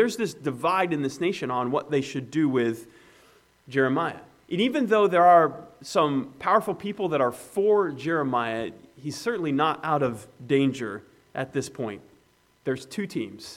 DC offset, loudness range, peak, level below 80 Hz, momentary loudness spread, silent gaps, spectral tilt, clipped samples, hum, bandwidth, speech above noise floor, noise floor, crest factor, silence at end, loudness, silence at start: under 0.1%; 6 LU; -6 dBFS; -68 dBFS; 13 LU; none; -5.5 dB/octave; under 0.1%; none; 16 kHz; 37 dB; -62 dBFS; 20 dB; 0 s; -25 LUFS; 0 s